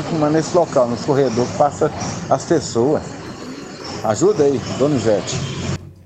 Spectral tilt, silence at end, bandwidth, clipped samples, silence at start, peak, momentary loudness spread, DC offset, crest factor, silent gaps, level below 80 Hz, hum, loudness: -5.5 dB/octave; 0.1 s; 9.2 kHz; under 0.1%; 0 s; -2 dBFS; 14 LU; under 0.1%; 16 dB; none; -48 dBFS; none; -18 LUFS